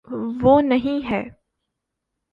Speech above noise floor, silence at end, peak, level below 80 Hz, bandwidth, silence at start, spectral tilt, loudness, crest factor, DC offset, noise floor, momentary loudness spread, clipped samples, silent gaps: 61 dB; 1 s; -2 dBFS; -48 dBFS; 5 kHz; 0.1 s; -8.5 dB/octave; -19 LUFS; 18 dB; under 0.1%; -80 dBFS; 12 LU; under 0.1%; none